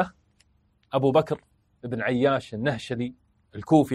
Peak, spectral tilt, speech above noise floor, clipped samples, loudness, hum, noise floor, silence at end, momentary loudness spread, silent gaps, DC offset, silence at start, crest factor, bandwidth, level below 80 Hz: -6 dBFS; -7 dB/octave; 42 dB; under 0.1%; -26 LUFS; none; -66 dBFS; 0 s; 14 LU; none; under 0.1%; 0 s; 20 dB; 13 kHz; -60 dBFS